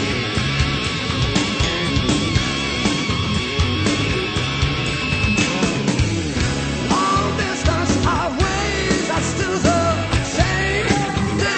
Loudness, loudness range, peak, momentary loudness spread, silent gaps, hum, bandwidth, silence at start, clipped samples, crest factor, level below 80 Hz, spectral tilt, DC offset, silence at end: -19 LUFS; 1 LU; -2 dBFS; 3 LU; none; none; 9 kHz; 0 s; under 0.1%; 16 dB; -30 dBFS; -4.5 dB/octave; under 0.1%; 0 s